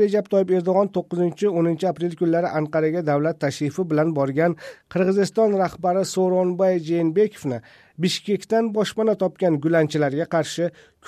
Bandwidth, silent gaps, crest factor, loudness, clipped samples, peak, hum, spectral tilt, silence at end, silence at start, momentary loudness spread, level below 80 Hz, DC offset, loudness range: 14.5 kHz; none; 14 dB; -22 LUFS; under 0.1%; -6 dBFS; none; -6.5 dB/octave; 0.35 s; 0 s; 5 LU; -64 dBFS; under 0.1%; 1 LU